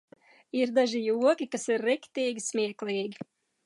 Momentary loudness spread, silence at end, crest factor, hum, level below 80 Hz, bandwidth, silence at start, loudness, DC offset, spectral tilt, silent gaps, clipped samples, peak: 10 LU; 0.4 s; 18 dB; none; -84 dBFS; 11.5 kHz; 0.55 s; -29 LUFS; under 0.1%; -3.5 dB/octave; none; under 0.1%; -12 dBFS